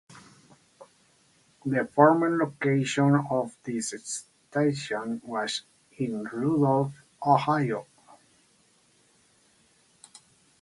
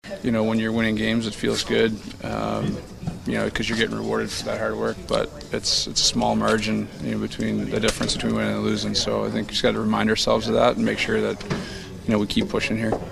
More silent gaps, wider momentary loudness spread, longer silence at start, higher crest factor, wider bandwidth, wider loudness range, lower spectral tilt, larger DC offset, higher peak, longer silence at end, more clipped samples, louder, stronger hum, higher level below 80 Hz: neither; first, 13 LU vs 8 LU; about the same, 0.15 s vs 0.05 s; about the same, 22 dB vs 20 dB; second, 11.5 kHz vs 14 kHz; first, 6 LU vs 3 LU; first, -5.5 dB/octave vs -4 dB/octave; neither; about the same, -6 dBFS vs -4 dBFS; first, 2.8 s vs 0 s; neither; second, -27 LUFS vs -23 LUFS; neither; second, -70 dBFS vs -42 dBFS